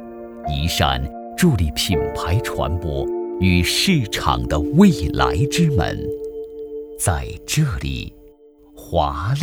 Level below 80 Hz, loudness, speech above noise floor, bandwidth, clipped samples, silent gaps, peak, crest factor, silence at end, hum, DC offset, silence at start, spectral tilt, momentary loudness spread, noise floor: -32 dBFS; -20 LUFS; 29 dB; over 20 kHz; under 0.1%; none; 0 dBFS; 20 dB; 0 s; none; under 0.1%; 0 s; -5 dB/octave; 14 LU; -48 dBFS